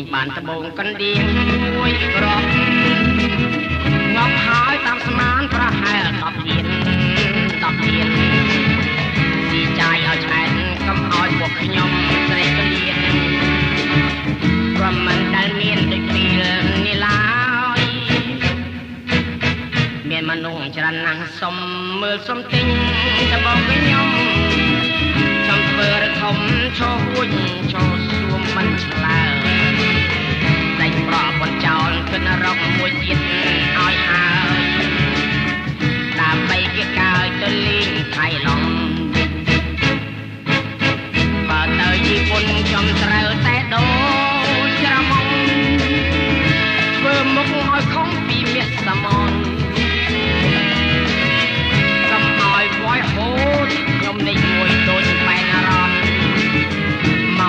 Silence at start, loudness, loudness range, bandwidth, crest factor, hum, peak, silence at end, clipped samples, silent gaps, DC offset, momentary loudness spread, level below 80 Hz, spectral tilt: 0 s; -16 LUFS; 3 LU; 9.2 kHz; 14 dB; none; -2 dBFS; 0 s; under 0.1%; none; under 0.1%; 5 LU; -32 dBFS; -5.5 dB/octave